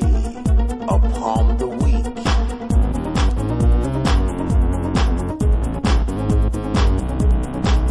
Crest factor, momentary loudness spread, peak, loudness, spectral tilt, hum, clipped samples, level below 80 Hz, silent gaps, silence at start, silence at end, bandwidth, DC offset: 12 dB; 2 LU; -6 dBFS; -20 LUFS; -7 dB/octave; none; under 0.1%; -18 dBFS; none; 0 s; 0 s; 11 kHz; under 0.1%